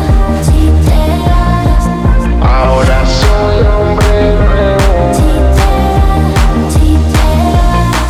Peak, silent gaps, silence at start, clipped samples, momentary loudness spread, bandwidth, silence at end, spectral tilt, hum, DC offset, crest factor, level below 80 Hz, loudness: 0 dBFS; none; 0 s; under 0.1%; 2 LU; 14 kHz; 0 s; -6.5 dB/octave; none; under 0.1%; 8 dB; -10 dBFS; -10 LUFS